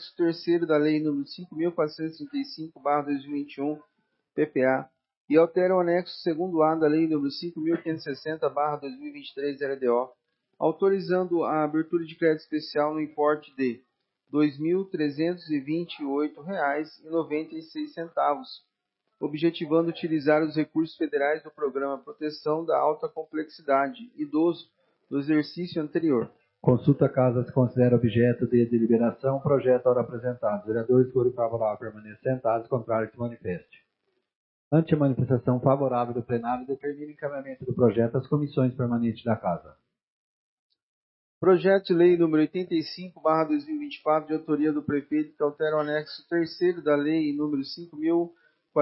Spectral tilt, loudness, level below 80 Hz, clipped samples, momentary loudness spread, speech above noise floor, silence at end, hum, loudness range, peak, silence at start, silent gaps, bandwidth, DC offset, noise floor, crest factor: -11 dB/octave; -26 LUFS; -66 dBFS; under 0.1%; 11 LU; 54 dB; 0 s; none; 6 LU; -8 dBFS; 0 s; 5.17-5.25 s, 34.35-34.71 s, 40.03-40.70 s, 40.83-41.41 s; 5.8 kHz; under 0.1%; -80 dBFS; 18 dB